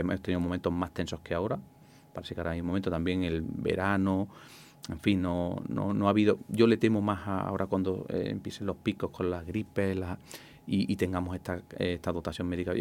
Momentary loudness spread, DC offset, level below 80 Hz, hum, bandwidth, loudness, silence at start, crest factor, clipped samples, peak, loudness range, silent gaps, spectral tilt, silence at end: 12 LU; under 0.1%; -58 dBFS; none; 16.5 kHz; -31 LUFS; 0 s; 20 dB; under 0.1%; -10 dBFS; 5 LU; none; -7 dB/octave; 0 s